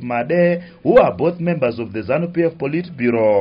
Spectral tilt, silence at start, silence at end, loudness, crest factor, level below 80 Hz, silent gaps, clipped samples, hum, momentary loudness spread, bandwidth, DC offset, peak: -7 dB/octave; 0 s; 0 s; -18 LUFS; 16 dB; -50 dBFS; none; under 0.1%; none; 8 LU; 5.4 kHz; under 0.1%; -2 dBFS